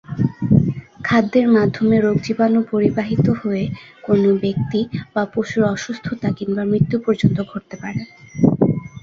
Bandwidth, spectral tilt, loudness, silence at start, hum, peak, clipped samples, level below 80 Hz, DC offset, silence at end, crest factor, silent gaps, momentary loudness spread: 7.4 kHz; -8 dB/octave; -18 LUFS; 0.1 s; none; -2 dBFS; under 0.1%; -46 dBFS; under 0.1%; 0.05 s; 16 dB; none; 11 LU